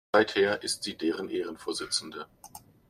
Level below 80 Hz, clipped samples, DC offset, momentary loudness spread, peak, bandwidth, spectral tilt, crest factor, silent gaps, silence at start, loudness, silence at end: -68 dBFS; under 0.1%; under 0.1%; 19 LU; -8 dBFS; 15.5 kHz; -2.5 dB/octave; 22 dB; none; 0.15 s; -29 LUFS; 0.3 s